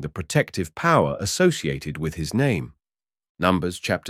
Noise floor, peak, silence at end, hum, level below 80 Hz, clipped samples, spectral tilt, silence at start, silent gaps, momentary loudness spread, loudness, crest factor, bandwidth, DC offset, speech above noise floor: under -90 dBFS; -4 dBFS; 0 s; none; -46 dBFS; under 0.1%; -5 dB/octave; 0 s; 3.29-3.35 s; 9 LU; -23 LUFS; 20 dB; 16 kHz; under 0.1%; over 67 dB